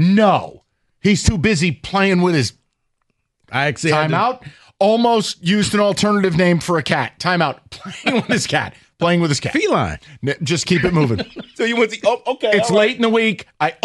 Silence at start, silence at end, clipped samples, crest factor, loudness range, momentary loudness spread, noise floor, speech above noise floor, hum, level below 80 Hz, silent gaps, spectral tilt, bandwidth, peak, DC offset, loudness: 0 s; 0.1 s; under 0.1%; 14 dB; 2 LU; 8 LU; -69 dBFS; 52 dB; none; -42 dBFS; none; -5 dB/octave; 12 kHz; -2 dBFS; under 0.1%; -17 LUFS